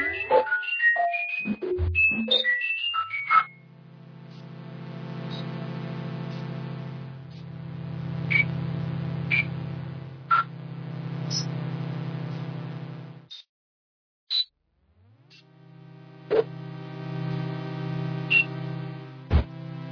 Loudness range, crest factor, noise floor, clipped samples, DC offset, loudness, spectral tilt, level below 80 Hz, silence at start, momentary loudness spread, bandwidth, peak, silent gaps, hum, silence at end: 12 LU; 22 dB; -67 dBFS; under 0.1%; under 0.1%; -26 LUFS; -5 dB/octave; -44 dBFS; 0 s; 19 LU; 5.4 kHz; -8 dBFS; 13.49-14.27 s; none; 0 s